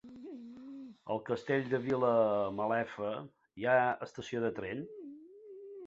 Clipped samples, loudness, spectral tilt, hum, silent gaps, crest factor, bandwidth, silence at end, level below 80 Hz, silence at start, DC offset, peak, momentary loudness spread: under 0.1%; -34 LUFS; -5 dB/octave; none; none; 18 dB; 7.8 kHz; 0 s; -72 dBFS; 0.05 s; under 0.1%; -16 dBFS; 20 LU